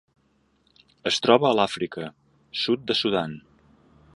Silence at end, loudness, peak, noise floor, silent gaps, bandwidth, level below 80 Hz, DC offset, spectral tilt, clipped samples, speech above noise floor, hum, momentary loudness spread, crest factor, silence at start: 0.75 s; -23 LUFS; -2 dBFS; -66 dBFS; none; 11.5 kHz; -64 dBFS; under 0.1%; -4.5 dB/octave; under 0.1%; 43 dB; none; 17 LU; 24 dB; 1.05 s